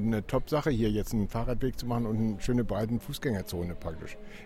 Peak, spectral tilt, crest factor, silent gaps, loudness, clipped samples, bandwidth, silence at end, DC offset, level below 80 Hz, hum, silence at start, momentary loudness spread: -16 dBFS; -7 dB/octave; 14 dB; none; -31 LUFS; under 0.1%; 16.5 kHz; 0 s; under 0.1%; -40 dBFS; none; 0 s; 8 LU